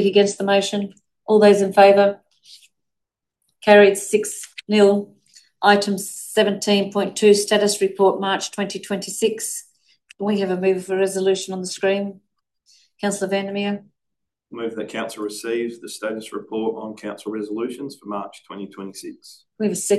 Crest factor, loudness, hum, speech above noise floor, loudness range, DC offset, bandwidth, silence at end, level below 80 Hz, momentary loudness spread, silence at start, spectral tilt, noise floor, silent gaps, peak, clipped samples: 20 dB; -19 LUFS; none; 63 dB; 11 LU; under 0.1%; 12.5 kHz; 0 s; -70 dBFS; 18 LU; 0 s; -4 dB/octave; -83 dBFS; none; 0 dBFS; under 0.1%